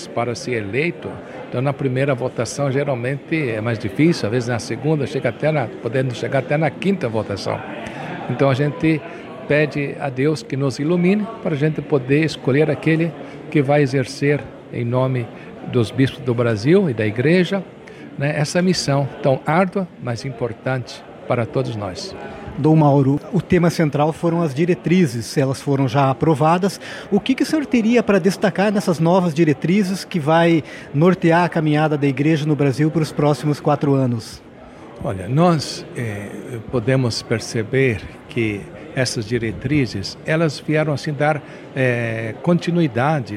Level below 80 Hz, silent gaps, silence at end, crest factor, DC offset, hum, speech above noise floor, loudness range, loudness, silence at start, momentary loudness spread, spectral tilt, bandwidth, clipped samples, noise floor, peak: -52 dBFS; none; 0 s; 16 dB; under 0.1%; none; 21 dB; 4 LU; -19 LUFS; 0 s; 11 LU; -6.5 dB/octave; 14 kHz; under 0.1%; -39 dBFS; -4 dBFS